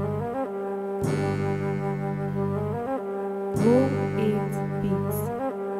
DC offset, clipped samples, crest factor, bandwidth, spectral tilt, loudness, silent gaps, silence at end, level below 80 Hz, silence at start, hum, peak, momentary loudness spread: under 0.1%; under 0.1%; 16 dB; 16 kHz; -8 dB/octave; -27 LUFS; none; 0 s; -54 dBFS; 0 s; none; -10 dBFS; 8 LU